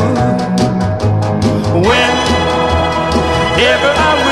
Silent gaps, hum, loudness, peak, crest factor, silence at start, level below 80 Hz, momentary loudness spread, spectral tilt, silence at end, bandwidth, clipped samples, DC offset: none; none; -12 LUFS; 0 dBFS; 12 dB; 0 s; -26 dBFS; 4 LU; -5.5 dB/octave; 0 s; 13 kHz; under 0.1%; under 0.1%